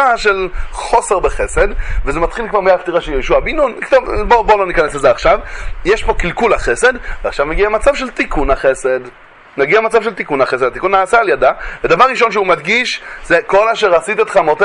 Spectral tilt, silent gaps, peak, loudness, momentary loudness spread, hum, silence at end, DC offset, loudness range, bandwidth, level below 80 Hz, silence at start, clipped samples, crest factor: -4 dB/octave; none; 0 dBFS; -13 LUFS; 8 LU; none; 0 s; under 0.1%; 3 LU; 11 kHz; -26 dBFS; 0 s; under 0.1%; 14 dB